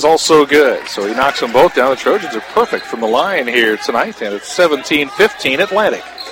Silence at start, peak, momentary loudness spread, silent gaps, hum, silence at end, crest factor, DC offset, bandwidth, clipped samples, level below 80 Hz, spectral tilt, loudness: 0 s; 0 dBFS; 9 LU; none; none; 0 s; 14 dB; under 0.1%; 17 kHz; under 0.1%; -50 dBFS; -3 dB/octave; -13 LUFS